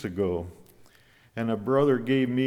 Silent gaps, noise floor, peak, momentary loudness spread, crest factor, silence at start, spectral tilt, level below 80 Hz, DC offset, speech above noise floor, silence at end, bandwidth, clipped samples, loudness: none; -58 dBFS; -12 dBFS; 15 LU; 16 dB; 0 s; -8 dB/octave; -58 dBFS; under 0.1%; 33 dB; 0 s; 13.5 kHz; under 0.1%; -26 LUFS